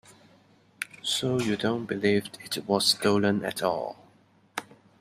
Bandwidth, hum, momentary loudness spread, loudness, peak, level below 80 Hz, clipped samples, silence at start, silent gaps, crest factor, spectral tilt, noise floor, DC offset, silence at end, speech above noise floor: 15.5 kHz; none; 15 LU; -26 LUFS; -8 dBFS; -68 dBFS; under 0.1%; 0.8 s; none; 20 dB; -4 dB/octave; -61 dBFS; under 0.1%; 0.4 s; 34 dB